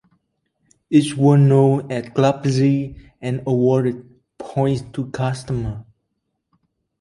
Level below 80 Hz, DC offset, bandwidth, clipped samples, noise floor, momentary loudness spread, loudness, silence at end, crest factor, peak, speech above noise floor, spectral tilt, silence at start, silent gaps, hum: -48 dBFS; under 0.1%; 11 kHz; under 0.1%; -74 dBFS; 16 LU; -19 LUFS; 1.2 s; 18 dB; -2 dBFS; 57 dB; -8 dB/octave; 0.9 s; none; none